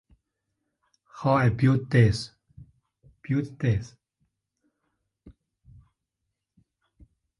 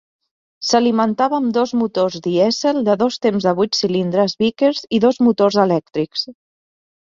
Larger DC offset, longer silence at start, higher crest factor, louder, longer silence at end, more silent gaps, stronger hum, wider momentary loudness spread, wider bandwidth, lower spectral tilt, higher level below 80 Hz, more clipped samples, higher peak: neither; first, 1.15 s vs 0.6 s; first, 22 dB vs 16 dB; second, -24 LUFS vs -17 LUFS; first, 2.1 s vs 0.7 s; neither; neither; first, 17 LU vs 6 LU; first, 11 kHz vs 7.6 kHz; first, -7.5 dB/octave vs -5 dB/octave; first, -50 dBFS vs -60 dBFS; neither; second, -6 dBFS vs -2 dBFS